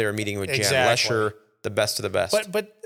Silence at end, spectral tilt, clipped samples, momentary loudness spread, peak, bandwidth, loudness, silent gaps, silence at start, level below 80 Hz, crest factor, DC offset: 0.2 s; -3 dB/octave; under 0.1%; 10 LU; -4 dBFS; 18 kHz; -23 LUFS; none; 0 s; -62 dBFS; 20 dB; under 0.1%